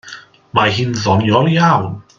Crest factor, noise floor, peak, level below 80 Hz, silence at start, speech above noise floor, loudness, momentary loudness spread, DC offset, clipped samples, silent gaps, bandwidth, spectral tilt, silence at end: 14 dB; -37 dBFS; 0 dBFS; -52 dBFS; 0.05 s; 24 dB; -14 LUFS; 6 LU; under 0.1%; under 0.1%; none; 7.4 kHz; -6 dB/octave; 0.15 s